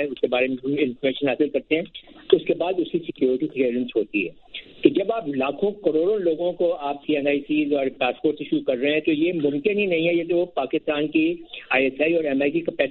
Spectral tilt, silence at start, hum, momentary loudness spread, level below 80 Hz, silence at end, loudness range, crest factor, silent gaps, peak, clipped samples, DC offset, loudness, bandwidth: -9.5 dB/octave; 0 s; none; 5 LU; -62 dBFS; 0 s; 1 LU; 22 dB; none; -2 dBFS; under 0.1%; under 0.1%; -23 LUFS; 4.3 kHz